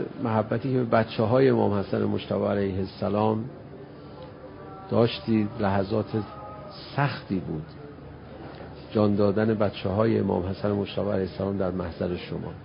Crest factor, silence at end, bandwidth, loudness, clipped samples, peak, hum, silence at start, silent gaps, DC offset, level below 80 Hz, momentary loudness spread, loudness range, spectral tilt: 20 dB; 0 s; 5.4 kHz; -26 LUFS; under 0.1%; -6 dBFS; none; 0 s; none; under 0.1%; -50 dBFS; 19 LU; 4 LU; -11.5 dB/octave